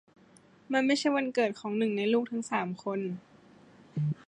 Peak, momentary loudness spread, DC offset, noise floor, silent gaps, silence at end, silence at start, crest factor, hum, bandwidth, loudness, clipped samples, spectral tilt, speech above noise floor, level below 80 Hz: -14 dBFS; 8 LU; under 0.1%; -59 dBFS; none; 0.15 s; 0.7 s; 18 dB; none; 10.5 kHz; -30 LUFS; under 0.1%; -5.5 dB/octave; 30 dB; -78 dBFS